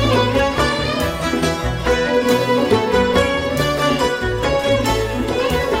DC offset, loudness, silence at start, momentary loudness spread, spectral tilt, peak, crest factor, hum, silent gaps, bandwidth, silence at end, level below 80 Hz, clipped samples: under 0.1%; -17 LUFS; 0 s; 4 LU; -5 dB/octave; -2 dBFS; 16 dB; none; none; 16 kHz; 0 s; -30 dBFS; under 0.1%